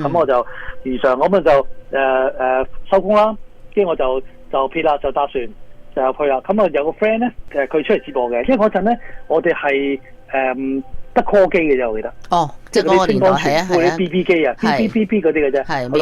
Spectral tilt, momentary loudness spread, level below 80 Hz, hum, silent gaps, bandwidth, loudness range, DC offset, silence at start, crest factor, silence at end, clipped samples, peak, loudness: -6 dB/octave; 9 LU; -38 dBFS; none; none; 13 kHz; 3 LU; under 0.1%; 0 s; 14 dB; 0 s; under 0.1%; -2 dBFS; -17 LUFS